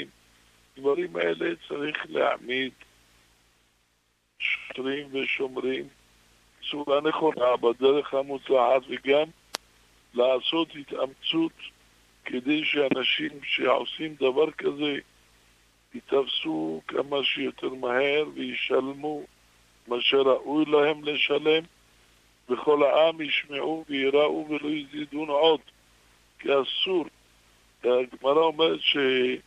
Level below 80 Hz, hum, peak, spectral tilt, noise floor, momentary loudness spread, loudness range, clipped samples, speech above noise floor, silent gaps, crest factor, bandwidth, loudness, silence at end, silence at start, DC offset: -68 dBFS; none; -4 dBFS; -4.5 dB/octave; -70 dBFS; 11 LU; 6 LU; under 0.1%; 44 dB; none; 22 dB; 12 kHz; -26 LUFS; 0.05 s; 0 s; under 0.1%